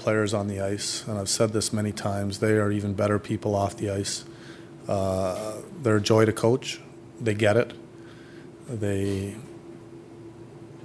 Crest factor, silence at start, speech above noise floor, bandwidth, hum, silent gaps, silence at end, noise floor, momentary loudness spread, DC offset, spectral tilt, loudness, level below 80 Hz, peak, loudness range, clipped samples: 20 dB; 0 s; 20 dB; 11 kHz; none; none; 0 s; -45 dBFS; 22 LU; under 0.1%; -5 dB/octave; -26 LUFS; -62 dBFS; -6 dBFS; 4 LU; under 0.1%